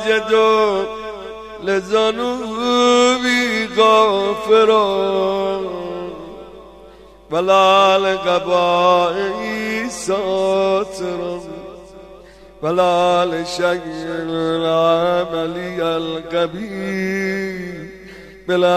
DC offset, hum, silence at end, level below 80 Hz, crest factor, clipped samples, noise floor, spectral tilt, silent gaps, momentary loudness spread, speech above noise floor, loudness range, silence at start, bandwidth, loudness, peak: under 0.1%; none; 0 s; -50 dBFS; 16 dB; under 0.1%; -42 dBFS; -4 dB/octave; none; 16 LU; 26 dB; 6 LU; 0 s; 14.5 kHz; -17 LUFS; -2 dBFS